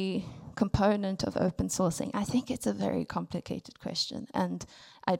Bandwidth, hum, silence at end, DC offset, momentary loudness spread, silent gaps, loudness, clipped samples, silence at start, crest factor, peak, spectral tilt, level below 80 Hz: 16.5 kHz; none; 0 s; under 0.1%; 10 LU; none; -32 LUFS; under 0.1%; 0 s; 18 dB; -12 dBFS; -5 dB/octave; -50 dBFS